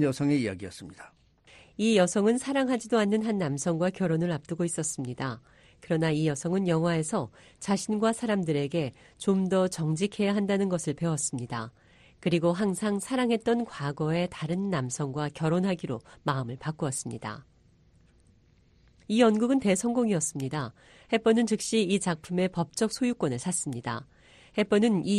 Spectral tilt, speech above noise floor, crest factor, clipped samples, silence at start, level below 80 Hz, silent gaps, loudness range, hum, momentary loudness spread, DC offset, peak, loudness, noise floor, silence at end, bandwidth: -5.5 dB/octave; 34 dB; 20 dB; under 0.1%; 0 s; -62 dBFS; none; 4 LU; none; 11 LU; under 0.1%; -8 dBFS; -28 LUFS; -62 dBFS; 0 s; 13 kHz